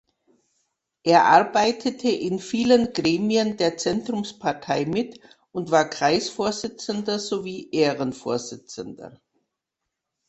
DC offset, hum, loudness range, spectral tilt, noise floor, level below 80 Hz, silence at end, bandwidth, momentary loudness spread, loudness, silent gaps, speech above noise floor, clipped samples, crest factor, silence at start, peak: under 0.1%; none; 7 LU; -4.5 dB/octave; -83 dBFS; -62 dBFS; 1.15 s; 8.2 kHz; 15 LU; -22 LUFS; none; 61 dB; under 0.1%; 22 dB; 1.05 s; -2 dBFS